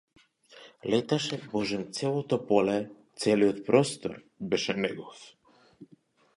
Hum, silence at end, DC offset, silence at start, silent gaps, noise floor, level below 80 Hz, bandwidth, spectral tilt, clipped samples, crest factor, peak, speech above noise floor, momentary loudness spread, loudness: none; 0.55 s; under 0.1%; 0.55 s; none; -62 dBFS; -68 dBFS; 11.5 kHz; -5 dB/octave; under 0.1%; 22 dB; -8 dBFS; 34 dB; 15 LU; -28 LUFS